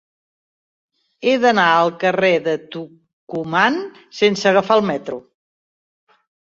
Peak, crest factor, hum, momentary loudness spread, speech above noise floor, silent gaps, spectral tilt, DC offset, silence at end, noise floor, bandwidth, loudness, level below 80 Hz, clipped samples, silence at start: -2 dBFS; 18 dB; none; 18 LU; over 73 dB; 3.13-3.27 s; -5 dB/octave; under 0.1%; 1.3 s; under -90 dBFS; 7.8 kHz; -17 LUFS; -64 dBFS; under 0.1%; 1.2 s